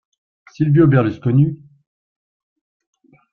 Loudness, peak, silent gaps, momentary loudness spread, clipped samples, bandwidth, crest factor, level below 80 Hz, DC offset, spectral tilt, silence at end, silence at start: -16 LUFS; -2 dBFS; none; 9 LU; under 0.1%; 4.7 kHz; 18 dB; -54 dBFS; under 0.1%; -10.5 dB/octave; 1.8 s; 0.6 s